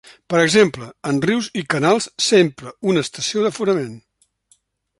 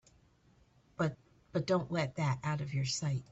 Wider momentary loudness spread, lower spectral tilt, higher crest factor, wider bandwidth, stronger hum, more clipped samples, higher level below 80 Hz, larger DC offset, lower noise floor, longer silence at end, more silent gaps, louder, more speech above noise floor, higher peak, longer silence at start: first, 8 LU vs 5 LU; second, -4 dB/octave vs -5.5 dB/octave; about the same, 18 dB vs 16 dB; first, 11.5 kHz vs 8.4 kHz; neither; neither; first, -60 dBFS vs -66 dBFS; neither; second, -61 dBFS vs -67 dBFS; first, 1 s vs 0.1 s; neither; first, -18 LUFS vs -35 LUFS; first, 43 dB vs 33 dB; first, -2 dBFS vs -20 dBFS; second, 0.3 s vs 1 s